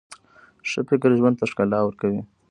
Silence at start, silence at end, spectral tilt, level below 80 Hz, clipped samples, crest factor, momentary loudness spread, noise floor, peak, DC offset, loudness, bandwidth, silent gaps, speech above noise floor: 0.1 s; 0.25 s; -7 dB/octave; -60 dBFS; under 0.1%; 18 dB; 11 LU; -54 dBFS; -6 dBFS; under 0.1%; -22 LUFS; 11 kHz; none; 33 dB